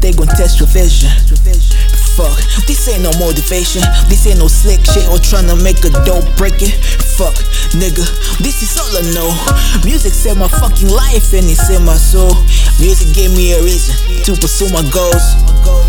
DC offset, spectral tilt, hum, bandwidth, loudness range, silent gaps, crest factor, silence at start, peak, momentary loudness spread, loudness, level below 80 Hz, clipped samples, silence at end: under 0.1%; -4 dB/octave; none; 18.5 kHz; 3 LU; none; 6 dB; 0 s; 0 dBFS; 4 LU; -11 LUFS; -8 dBFS; 0.3%; 0 s